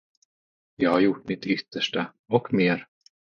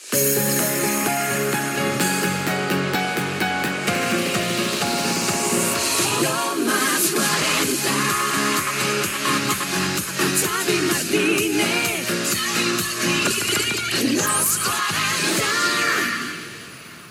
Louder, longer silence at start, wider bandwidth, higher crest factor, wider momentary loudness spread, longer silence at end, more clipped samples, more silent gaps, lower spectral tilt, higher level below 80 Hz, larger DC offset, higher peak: second, -25 LUFS vs -20 LUFS; first, 0.8 s vs 0 s; second, 7 kHz vs 19 kHz; first, 22 dB vs 16 dB; first, 9 LU vs 4 LU; first, 0.55 s vs 0 s; neither; first, 2.19-2.24 s vs none; first, -6.5 dB/octave vs -2.5 dB/octave; second, -66 dBFS vs -58 dBFS; neither; about the same, -6 dBFS vs -6 dBFS